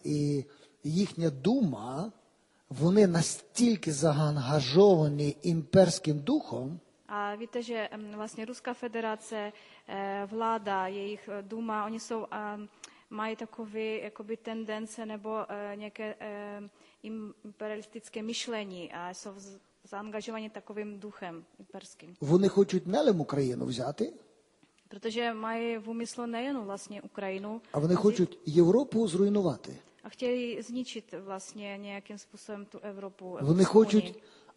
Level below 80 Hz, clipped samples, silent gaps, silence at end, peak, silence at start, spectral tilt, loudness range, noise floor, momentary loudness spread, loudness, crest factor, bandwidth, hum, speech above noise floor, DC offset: -70 dBFS; under 0.1%; none; 0.35 s; -8 dBFS; 0.05 s; -6 dB/octave; 13 LU; -67 dBFS; 19 LU; -31 LUFS; 22 dB; 11.5 kHz; none; 36 dB; under 0.1%